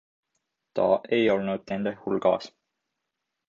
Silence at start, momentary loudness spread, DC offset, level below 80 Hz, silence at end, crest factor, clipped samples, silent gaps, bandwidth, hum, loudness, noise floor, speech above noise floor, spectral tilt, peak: 0.75 s; 8 LU; under 0.1%; -66 dBFS; 1 s; 20 dB; under 0.1%; none; 7.2 kHz; none; -26 LUFS; -83 dBFS; 58 dB; -7 dB/octave; -8 dBFS